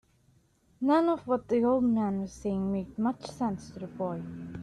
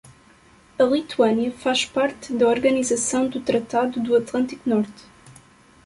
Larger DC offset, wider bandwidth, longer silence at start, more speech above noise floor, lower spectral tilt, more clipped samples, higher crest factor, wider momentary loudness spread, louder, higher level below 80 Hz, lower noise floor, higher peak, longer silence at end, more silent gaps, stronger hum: neither; about the same, 10.5 kHz vs 11.5 kHz; about the same, 0.8 s vs 0.8 s; first, 37 dB vs 32 dB; first, -7.5 dB/octave vs -3.5 dB/octave; neither; about the same, 16 dB vs 16 dB; first, 11 LU vs 4 LU; second, -30 LUFS vs -22 LUFS; about the same, -58 dBFS vs -58 dBFS; first, -66 dBFS vs -53 dBFS; second, -14 dBFS vs -6 dBFS; second, 0 s vs 0.55 s; neither; neither